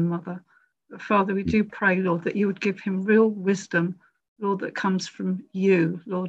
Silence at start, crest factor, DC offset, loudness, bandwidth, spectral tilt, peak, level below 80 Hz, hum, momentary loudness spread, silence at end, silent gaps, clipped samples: 0 s; 16 dB; under 0.1%; -24 LUFS; 8.2 kHz; -7 dB/octave; -8 dBFS; -54 dBFS; none; 10 LU; 0 s; 4.28-4.36 s; under 0.1%